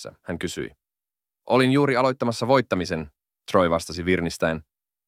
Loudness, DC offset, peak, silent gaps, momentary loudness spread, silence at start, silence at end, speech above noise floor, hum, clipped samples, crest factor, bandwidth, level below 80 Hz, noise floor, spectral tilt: -23 LUFS; under 0.1%; -6 dBFS; none; 15 LU; 0 s; 0.45 s; over 67 dB; none; under 0.1%; 18 dB; 15.5 kHz; -52 dBFS; under -90 dBFS; -5.5 dB/octave